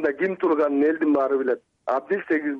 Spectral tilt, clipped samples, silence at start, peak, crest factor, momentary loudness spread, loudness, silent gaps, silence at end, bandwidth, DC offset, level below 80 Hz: -8 dB/octave; under 0.1%; 0 s; -12 dBFS; 12 dB; 7 LU; -23 LUFS; none; 0 s; 5.4 kHz; under 0.1%; -70 dBFS